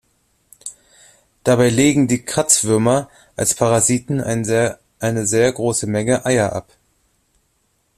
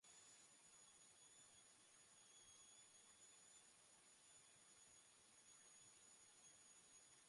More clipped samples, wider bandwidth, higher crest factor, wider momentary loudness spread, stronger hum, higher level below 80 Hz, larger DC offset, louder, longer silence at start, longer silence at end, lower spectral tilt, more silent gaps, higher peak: neither; first, 15.5 kHz vs 11.5 kHz; about the same, 18 dB vs 14 dB; first, 12 LU vs 3 LU; neither; first, -50 dBFS vs under -90 dBFS; neither; first, -17 LUFS vs -67 LUFS; first, 0.65 s vs 0 s; first, 1.35 s vs 0 s; first, -4.5 dB/octave vs 0 dB/octave; neither; first, 0 dBFS vs -56 dBFS